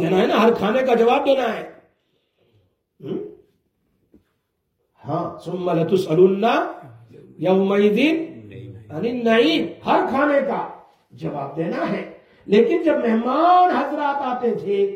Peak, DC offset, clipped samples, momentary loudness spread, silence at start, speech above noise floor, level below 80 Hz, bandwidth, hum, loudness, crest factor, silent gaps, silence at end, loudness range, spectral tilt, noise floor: -4 dBFS; under 0.1%; under 0.1%; 17 LU; 0 s; 54 dB; -64 dBFS; 15 kHz; none; -19 LUFS; 18 dB; none; 0 s; 14 LU; -7 dB/octave; -72 dBFS